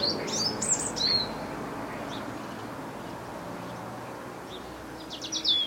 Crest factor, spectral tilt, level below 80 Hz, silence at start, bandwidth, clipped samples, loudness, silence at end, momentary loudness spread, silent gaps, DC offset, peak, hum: 18 dB; -2 dB/octave; -56 dBFS; 0 s; 16.5 kHz; under 0.1%; -31 LUFS; 0 s; 15 LU; none; under 0.1%; -14 dBFS; none